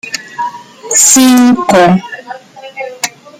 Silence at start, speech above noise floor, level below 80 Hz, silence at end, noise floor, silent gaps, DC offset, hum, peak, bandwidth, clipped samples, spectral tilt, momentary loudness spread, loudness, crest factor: 0.05 s; 22 dB; -52 dBFS; 0.3 s; -28 dBFS; none; under 0.1%; none; 0 dBFS; over 20 kHz; 0.2%; -3 dB/octave; 22 LU; -7 LUFS; 10 dB